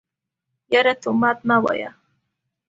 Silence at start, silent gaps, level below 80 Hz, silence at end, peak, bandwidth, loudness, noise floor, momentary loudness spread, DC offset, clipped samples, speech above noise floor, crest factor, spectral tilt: 0.7 s; none; -64 dBFS; 0.8 s; -4 dBFS; 7.8 kHz; -19 LUFS; -81 dBFS; 8 LU; under 0.1%; under 0.1%; 62 dB; 18 dB; -5.5 dB/octave